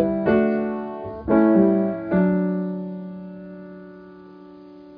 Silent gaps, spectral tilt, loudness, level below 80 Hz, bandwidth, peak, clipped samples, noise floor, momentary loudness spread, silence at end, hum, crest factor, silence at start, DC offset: none; -12 dB/octave; -21 LUFS; -50 dBFS; 4.8 kHz; -6 dBFS; under 0.1%; -43 dBFS; 22 LU; 0 s; none; 16 dB; 0 s; under 0.1%